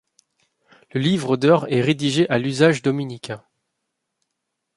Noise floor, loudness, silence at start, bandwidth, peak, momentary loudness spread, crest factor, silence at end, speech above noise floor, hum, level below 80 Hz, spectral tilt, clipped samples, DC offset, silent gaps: -78 dBFS; -19 LUFS; 0.95 s; 11.5 kHz; -2 dBFS; 14 LU; 20 dB; 1.4 s; 60 dB; none; -62 dBFS; -6 dB/octave; under 0.1%; under 0.1%; none